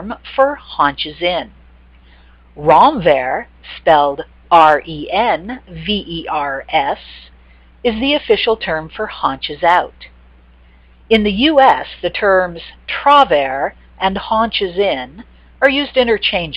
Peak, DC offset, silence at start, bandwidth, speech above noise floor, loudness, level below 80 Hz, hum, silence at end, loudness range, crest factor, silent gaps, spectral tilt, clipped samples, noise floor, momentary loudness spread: 0 dBFS; under 0.1%; 0 s; 9 kHz; 31 dB; -15 LUFS; -40 dBFS; none; 0 s; 5 LU; 16 dB; none; -6 dB/octave; under 0.1%; -45 dBFS; 13 LU